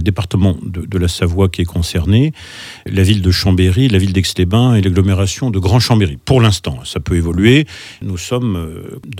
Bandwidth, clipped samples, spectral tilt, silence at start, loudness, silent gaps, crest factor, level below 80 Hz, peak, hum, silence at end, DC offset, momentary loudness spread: 15.5 kHz; under 0.1%; -6 dB/octave; 0 s; -14 LUFS; none; 14 dB; -34 dBFS; 0 dBFS; none; 0 s; under 0.1%; 11 LU